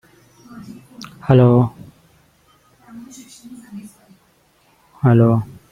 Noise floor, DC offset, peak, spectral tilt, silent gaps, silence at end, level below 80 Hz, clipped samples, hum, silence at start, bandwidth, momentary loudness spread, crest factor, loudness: -57 dBFS; under 0.1%; 0 dBFS; -9 dB/octave; none; 0.25 s; -52 dBFS; under 0.1%; none; 1.25 s; 10.5 kHz; 27 LU; 18 dB; -15 LUFS